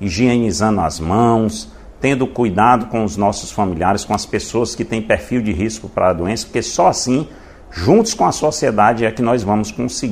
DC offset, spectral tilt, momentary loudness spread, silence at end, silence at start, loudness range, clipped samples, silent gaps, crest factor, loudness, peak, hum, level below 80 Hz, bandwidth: under 0.1%; -5 dB/octave; 8 LU; 0 s; 0 s; 3 LU; under 0.1%; none; 16 dB; -16 LUFS; 0 dBFS; none; -38 dBFS; 15 kHz